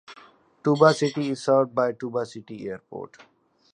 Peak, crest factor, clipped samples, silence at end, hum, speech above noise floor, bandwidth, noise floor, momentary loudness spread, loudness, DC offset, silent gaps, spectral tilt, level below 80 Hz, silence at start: -2 dBFS; 22 dB; under 0.1%; 0.65 s; none; 30 dB; 11 kHz; -54 dBFS; 19 LU; -23 LUFS; under 0.1%; none; -6 dB/octave; -72 dBFS; 0.1 s